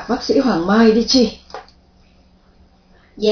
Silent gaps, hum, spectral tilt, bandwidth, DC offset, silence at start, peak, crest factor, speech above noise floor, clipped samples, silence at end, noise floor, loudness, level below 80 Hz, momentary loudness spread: none; none; -4.5 dB/octave; 5.4 kHz; under 0.1%; 0 s; 0 dBFS; 16 dB; 37 dB; under 0.1%; 0 s; -51 dBFS; -15 LUFS; -44 dBFS; 23 LU